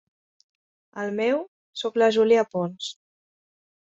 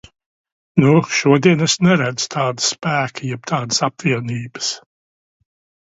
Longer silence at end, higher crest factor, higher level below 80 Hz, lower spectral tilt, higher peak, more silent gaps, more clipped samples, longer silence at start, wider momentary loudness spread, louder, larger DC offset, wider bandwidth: second, 0.9 s vs 1.1 s; about the same, 18 dB vs 18 dB; second, -72 dBFS vs -58 dBFS; about the same, -5 dB/octave vs -4.5 dB/octave; second, -8 dBFS vs 0 dBFS; first, 1.48-1.73 s vs none; neither; first, 0.95 s vs 0.75 s; first, 15 LU vs 10 LU; second, -24 LUFS vs -17 LUFS; neither; about the same, 7.8 kHz vs 8 kHz